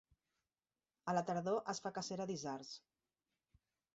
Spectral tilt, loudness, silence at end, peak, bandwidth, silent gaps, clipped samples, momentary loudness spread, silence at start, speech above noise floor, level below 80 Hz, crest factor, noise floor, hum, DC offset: -4.5 dB/octave; -42 LUFS; 1.2 s; -24 dBFS; 8 kHz; none; under 0.1%; 11 LU; 1.05 s; over 48 dB; -82 dBFS; 22 dB; under -90 dBFS; none; under 0.1%